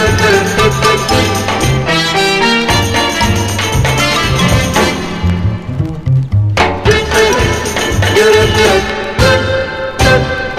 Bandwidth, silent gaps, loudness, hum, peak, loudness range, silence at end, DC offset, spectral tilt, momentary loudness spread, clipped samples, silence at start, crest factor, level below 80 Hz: 14.5 kHz; none; -11 LUFS; none; 0 dBFS; 2 LU; 0 s; under 0.1%; -4.5 dB/octave; 6 LU; under 0.1%; 0 s; 12 dB; -24 dBFS